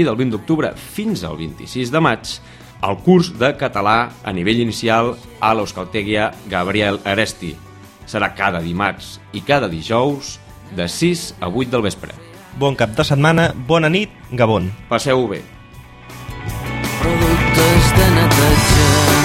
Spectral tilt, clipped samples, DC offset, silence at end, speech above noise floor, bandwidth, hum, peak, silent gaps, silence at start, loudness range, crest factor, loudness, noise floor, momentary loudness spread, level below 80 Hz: -5 dB/octave; under 0.1%; under 0.1%; 0 s; 22 dB; 16.5 kHz; none; 0 dBFS; none; 0 s; 5 LU; 16 dB; -17 LUFS; -39 dBFS; 17 LU; -30 dBFS